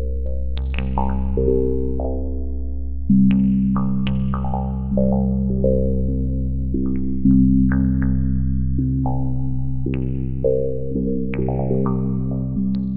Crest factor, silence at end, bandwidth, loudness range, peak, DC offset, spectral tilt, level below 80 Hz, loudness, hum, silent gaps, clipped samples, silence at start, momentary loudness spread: 14 dB; 0 s; 4 kHz; 3 LU; -6 dBFS; under 0.1%; -10 dB/octave; -26 dBFS; -21 LUFS; none; none; under 0.1%; 0 s; 9 LU